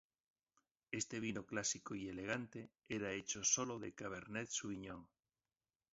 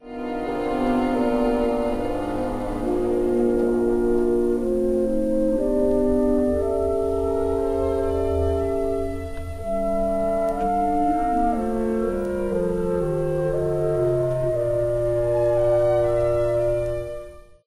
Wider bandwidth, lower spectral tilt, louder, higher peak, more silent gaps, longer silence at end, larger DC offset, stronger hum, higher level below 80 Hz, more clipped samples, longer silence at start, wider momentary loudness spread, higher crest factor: second, 7.6 kHz vs 14 kHz; second, -3.5 dB/octave vs -8 dB/octave; second, -43 LUFS vs -23 LUFS; second, -22 dBFS vs -10 dBFS; neither; first, 0.85 s vs 0.25 s; neither; neither; second, -74 dBFS vs -36 dBFS; neither; first, 0.9 s vs 0.05 s; first, 13 LU vs 6 LU; first, 24 dB vs 12 dB